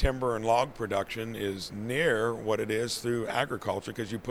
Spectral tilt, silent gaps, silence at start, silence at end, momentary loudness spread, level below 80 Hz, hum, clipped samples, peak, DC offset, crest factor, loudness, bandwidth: -5 dB/octave; none; 0 s; 0 s; 8 LU; -40 dBFS; none; under 0.1%; -10 dBFS; under 0.1%; 18 dB; -30 LUFS; 16.5 kHz